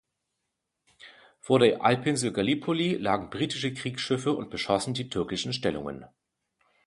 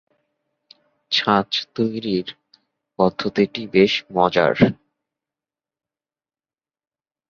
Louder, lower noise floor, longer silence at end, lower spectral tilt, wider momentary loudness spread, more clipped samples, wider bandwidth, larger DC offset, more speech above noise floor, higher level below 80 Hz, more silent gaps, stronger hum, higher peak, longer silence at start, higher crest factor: second, -27 LUFS vs -19 LUFS; second, -82 dBFS vs under -90 dBFS; second, 0.8 s vs 2.55 s; about the same, -5 dB/octave vs -6 dB/octave; about the same, 9 LU vs 8 LU; neither; first, 11.5 kHz vs 7.2 kHz; neither; second, 55 dB vs over 71 dB; about the same, -60 dBFS vs -58 dBFS; neither; neither; second, -8 dBFS vs -2 dBFS; about the same, 1 s vs 1.1 s; about the same, 22 dB vs 22 dB